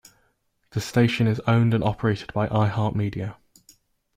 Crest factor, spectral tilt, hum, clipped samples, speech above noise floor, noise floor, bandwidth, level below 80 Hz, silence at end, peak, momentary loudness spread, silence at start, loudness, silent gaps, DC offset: 18 dB; -7 dB/octave; none; under 0.1%; 47 dB; -69 dBFS; 14 kHz; -52 dBFS; 0.85 s; -6 dBFS; 11 LU; 0.75 s; -23 LUFS; none; under 0.1%